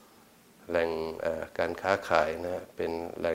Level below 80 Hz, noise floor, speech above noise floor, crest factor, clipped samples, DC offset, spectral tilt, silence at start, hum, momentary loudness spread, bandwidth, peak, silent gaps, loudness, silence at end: -58 dBFS; -58 dBFS; 28 dB; 24 dB; under 0.1%; under 0.1%; -5 dB/octave; 0.6 s; none; 8 LU; 16 kHz; -8 dBFS; none; -31 LUFS; 0 s